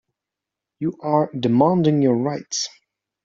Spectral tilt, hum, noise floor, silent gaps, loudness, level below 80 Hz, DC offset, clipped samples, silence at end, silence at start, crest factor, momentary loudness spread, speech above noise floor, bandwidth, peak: -6.5 dB/octave; none; -86 dBFS; none; -20 LUFS; -62 dBFS; under 0.1%; under 0.1%; 0.55 s; 0.8 s; 18 dB; 11 LU; 66 dB; 7.8 kHz; -4 dBFS